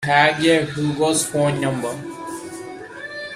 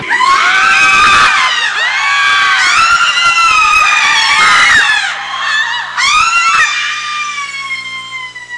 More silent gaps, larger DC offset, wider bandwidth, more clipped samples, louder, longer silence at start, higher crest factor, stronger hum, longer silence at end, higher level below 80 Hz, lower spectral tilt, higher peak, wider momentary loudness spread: neither; neither; first, 15.5 kHz vs 12 kHz; neither; second, -19 LUFS vs -8 LUFS; about the same, 0 s vs 0 s; first, 20 dB vs 10 dB; second, none vs 60 Hz at -50 dBFS; about the same, 0 s vs 0 s; second, -56 dBFS vs -44 dBFS; first, -4 dB/octave vs 1 dB/octave; about the same, 0 dBFS vs 0 dBFS; first, 18 LU vs 12 LU